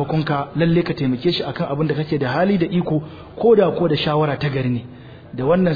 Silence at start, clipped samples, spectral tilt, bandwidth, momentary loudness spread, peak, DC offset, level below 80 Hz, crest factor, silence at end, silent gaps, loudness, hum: 0 s; under 0.1%; -9 dB/octave; 5 kHz; 9 LU; -4 dBFS; under 0.1%; -46 dBFS; 14 dB; 0 s; none; -19 LUFS; none